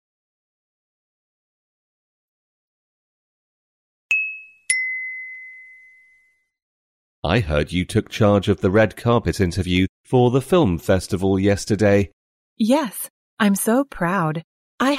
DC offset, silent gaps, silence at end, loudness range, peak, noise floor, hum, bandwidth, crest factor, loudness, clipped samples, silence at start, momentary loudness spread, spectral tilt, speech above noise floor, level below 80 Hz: under 0.1%; 6.62-7.22 s, 9.89-10.04 s, 12.13-12.56 s, 13.10-13.37 s, 14.44-14.78 s; 0 s; 8 LU; -4 dBFS; -60 dBFS; none; 16 kHz; 18 dB; -20 LUFS; under 0.1%; 4.1 s; 12 LU; -5.5 dB/octave; 42 dB; -42 dBFS